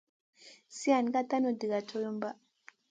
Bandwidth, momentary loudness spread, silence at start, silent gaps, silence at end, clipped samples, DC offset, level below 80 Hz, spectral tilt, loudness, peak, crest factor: 9.4 kHz; 13 LU; 0.45 s; none; 0.55 s; under 0.1%; under 0.1%; -86 dBFS; -4.5 dB/octave; -32 LUFS; -14 dBFS; 20 dB